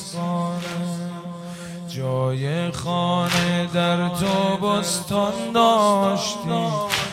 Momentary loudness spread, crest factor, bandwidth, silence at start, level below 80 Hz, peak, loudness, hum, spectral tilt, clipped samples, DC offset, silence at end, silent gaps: 13 LU; 18 dB; 16 kHz; 0 s; -56 dBFS; -2 dBFS; -22 LUFS; none; -5 dB/octave; under 0.1%; under 0.1%; 0 s; none